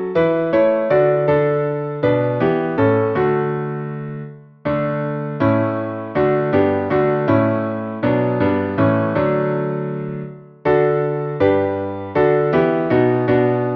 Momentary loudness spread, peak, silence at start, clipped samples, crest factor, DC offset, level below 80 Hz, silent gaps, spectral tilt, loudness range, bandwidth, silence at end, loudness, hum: 8 LU; -2 dBFS; 0 s; under 0.1%; 14 dB; under 0.1%; -50 dBFS; none; -10.5 dB/octave; 3 LU; 5.6 kHz; 0 s; -18 LUFS; none